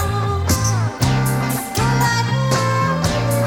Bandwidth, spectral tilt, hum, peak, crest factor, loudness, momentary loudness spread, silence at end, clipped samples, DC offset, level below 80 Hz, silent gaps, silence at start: 16.5 kHz; -5 dB/octave; none; -4 dBFS; 14 dB; -18 LUFS; 3 LU; 0 s; under 0.1%; 0.1%; -34 dBFS; none; 0 s